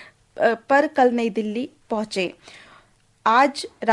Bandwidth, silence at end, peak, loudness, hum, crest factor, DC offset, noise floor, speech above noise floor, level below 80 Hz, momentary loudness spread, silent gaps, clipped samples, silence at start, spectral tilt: 11.5 kHz; 0 s; -4 dBFS; -21 LUFS; none; 18 dB; under 0.1%; -56 dBFS; 36 dB; -66 dBFS; 11 LU; none; under 0.1%; 0 s; -4.5 dB/octave